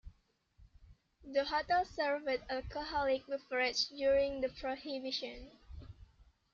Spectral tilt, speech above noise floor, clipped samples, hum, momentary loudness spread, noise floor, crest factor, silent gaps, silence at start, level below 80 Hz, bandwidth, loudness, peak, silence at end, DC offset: -3.5 dB/octave; 35 dB; under 0.1%; none; 21 LU; -70 dBFS; 18 dB; none; 0.05 s; -58 dBFS; 7.4 kHz; -36 LUFS; -20 dBFS; 0.3 s; under 0.1%